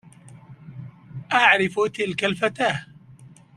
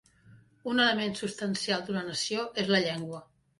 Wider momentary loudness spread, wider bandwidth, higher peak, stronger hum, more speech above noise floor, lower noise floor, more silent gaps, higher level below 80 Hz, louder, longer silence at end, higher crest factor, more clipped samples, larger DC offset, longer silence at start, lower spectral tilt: first, 24 LU vs 13 LU; about the same, 12.5 kHz vs 11.5 kHz; first, -2 dBFS vs -12 dBFS; neither; about the same, 27 dB vs 28 dB; second, -48 dBFS vs -58 dBFS; neither; first, -62 dBFS vs -70 dBFS; first, -21 LUFS vs -29 LUFS; about the same, 0.3 s vs 0.35 s; about the same, 22 dB vs 20 dB; neither; neither; about the same, 0.25 s vs 0.3 s; about the same, -4.5 dB/octave vs -3.5 dB/octave